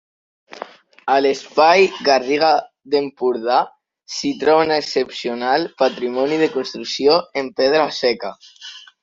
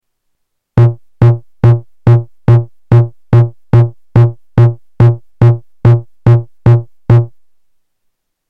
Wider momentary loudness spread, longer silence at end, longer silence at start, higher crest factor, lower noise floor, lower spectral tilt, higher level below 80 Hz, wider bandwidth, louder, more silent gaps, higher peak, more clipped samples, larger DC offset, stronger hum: first, 16 LU vs 1 LU; second, 0.25 s vs 1.25 s; second, 0.55 s vs 0.75 s; first, 18 dB vs 10 dB; second, -37 dBFS vs -67 dBFS; second, -3.5 dB/octave vs -10.5 dB/octave; second, -64 dBFS vs -34 dBFS; first, 7.8 kHz vs 3.7 kHz; second, -18 LUFS vs -11 LUFS; neither; about the same, -2 dBFS vs 0 dBFS; neither; second, under 0.1% vs 0.8%; neither